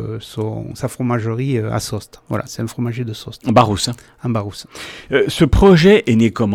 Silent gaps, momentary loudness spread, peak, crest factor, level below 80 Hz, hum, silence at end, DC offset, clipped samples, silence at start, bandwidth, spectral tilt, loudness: none; 17 LU; -2 dBFS; 16 dB; -32 dBFS; none; 0 s; under 0.1%; under 0.1%; 0 s; 16 kHz; -6 dB/octave; -17 LUFS